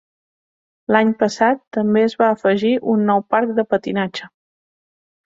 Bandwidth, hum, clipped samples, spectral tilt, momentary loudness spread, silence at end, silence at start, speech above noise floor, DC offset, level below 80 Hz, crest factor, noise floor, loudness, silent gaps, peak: 7.6 kHz; none; under 0.1%; -6 dB/octave; 7 LU; 1 s; 0.9 s; over 73 dB; under 0.1%; -62 dBFS; 16 dB; under -90 dBFS; -18 LUFS; 1.67-1.71 s; -2 dBFS